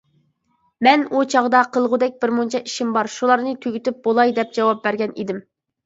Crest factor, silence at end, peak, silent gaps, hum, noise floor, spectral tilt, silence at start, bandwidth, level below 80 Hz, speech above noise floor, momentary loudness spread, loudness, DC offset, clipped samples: 20 dB; 0.45 s; 0 dBFS; none; none; -66 dBFS; -4 dB/octave; 0.8 s; 8 kHz; -70 dBFS; 47 dB; 9 LU; -19 LUFS; under 0.1%; under 0.1%